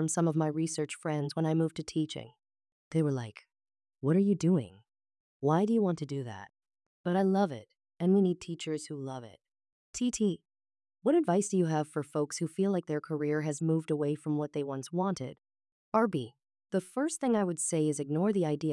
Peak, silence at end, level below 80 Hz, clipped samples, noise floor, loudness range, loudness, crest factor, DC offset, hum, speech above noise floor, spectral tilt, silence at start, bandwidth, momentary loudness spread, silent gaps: -16 dBFS; 0 s; -74 dBFS; under 0.1%; under -90 dBFS; 3 LU; -31 LUFS; 16 dB; under 0.1%; none; over 60 dB; -6.5 dB/octave; 0 s; 12 kHz; 12 LU; 2.72-2.91 s, 5.20-5.40 s, 6.86-7.04 s, 9.72-9.93 s, 15.72-15.92 s